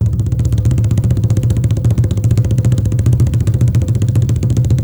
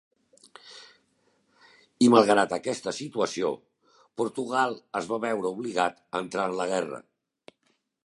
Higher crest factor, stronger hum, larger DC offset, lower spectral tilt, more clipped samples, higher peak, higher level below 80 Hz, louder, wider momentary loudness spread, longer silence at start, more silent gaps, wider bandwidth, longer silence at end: second, 10 dB vs 24 dB; neither; neither; first, -8 dB/octave vs -4.5 dB/octave; neither; about the same, -2 dBFS vs -4 dBFS; first, -24 dBFS vs -72 dBFS; first, -14 LUFS vs -26 LUFS; second, 1 LU vs 22 LU; second, 0 s vs 0.65 s; neither; about the same, 12 kHz vs 11.5 kHz; second, 0 s vs 1.05 s